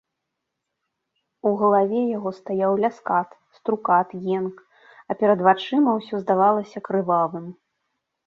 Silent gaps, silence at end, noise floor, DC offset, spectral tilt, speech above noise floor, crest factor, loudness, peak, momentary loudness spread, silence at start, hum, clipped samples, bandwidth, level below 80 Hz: none; 0.75 s; -81 dBFS; under 0.1%; -8 dB/octave; 60 dB; 20 dB; -22 LUFS; -4 dBFS; 10 LU; 1.45 s; none; under 0.1%; 7 kHz; -72 dBFS